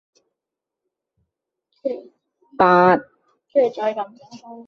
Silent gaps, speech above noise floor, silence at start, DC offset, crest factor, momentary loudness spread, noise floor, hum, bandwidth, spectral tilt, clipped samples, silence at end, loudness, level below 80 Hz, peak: none; 67 dB; 1.85 s; under 0.1%; 20 dB; 19 LU; -85 dBFS; none; 6.8 kHz; -7.5 dB/octave; under 0.1%; 0.05 s; -19 LUFS; -64 dBFS; -2 dBFS